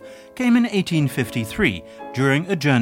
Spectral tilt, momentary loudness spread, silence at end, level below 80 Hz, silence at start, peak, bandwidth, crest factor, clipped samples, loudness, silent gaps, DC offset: -6 dB/octave; 11 LU; 0 s; -48 dBFS; 0 s; -4 dBFS; 16.5 kHz; 16 dB; under 0.1%; -20 LUFS; none; under 0.1%